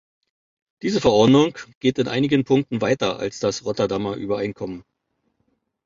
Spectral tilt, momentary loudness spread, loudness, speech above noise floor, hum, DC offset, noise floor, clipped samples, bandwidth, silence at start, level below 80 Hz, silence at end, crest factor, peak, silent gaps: -6 dB/octave; 12 LU; -21 LUFS; 52 dB; none; under 0.1%; -73 dBFS; under 0.1%; 7.6 kHz; 0.85 s; -52 dBFS; 1.05 s; 18 dB; -4 dBFS; 1.75-1.81 s